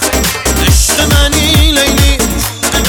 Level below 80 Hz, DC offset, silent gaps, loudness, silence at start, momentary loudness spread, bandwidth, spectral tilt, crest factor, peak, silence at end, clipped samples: -14 dBFS; under 0.1%; none; -9 LUFS; 0 s; 4 LU; over 20 kHz; -3 dB/octave; 10 dB; 0 dBFS; 0 s; under 0.1%